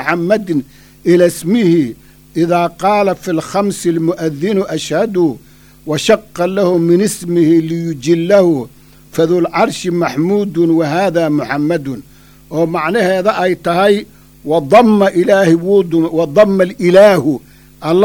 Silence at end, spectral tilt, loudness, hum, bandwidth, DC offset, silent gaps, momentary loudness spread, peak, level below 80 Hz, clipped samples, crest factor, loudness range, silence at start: 0 s; -6 dB/octave; -13 LUFS; none; 19 kHz; under 0.1%; none; 9 LU; 0 dBFS; -48 dBFS; under 0.1%; 12 dB; 4 LU; 0 s